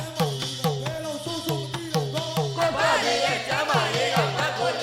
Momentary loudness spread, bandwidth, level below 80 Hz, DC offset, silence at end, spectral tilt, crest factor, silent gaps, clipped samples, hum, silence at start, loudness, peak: 8 LU; 18 kHz; -56 dBFS; under 0.1%; 0 s; -4 dB/octave; 18 dB; none; under 0.1%; none; 0 s; -25 LUFS; -8 dBFS